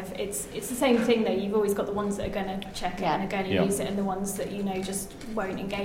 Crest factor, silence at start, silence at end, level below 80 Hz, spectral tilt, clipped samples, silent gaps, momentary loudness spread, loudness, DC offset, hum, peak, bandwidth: 18 dB; 0 s; 0 s; -48 dBFS; -4.5 dB/octave; under 0.1%; none; 9 LU; -28 LUFS; under 0.1%; none; -10 dBFS; 16.5 kHz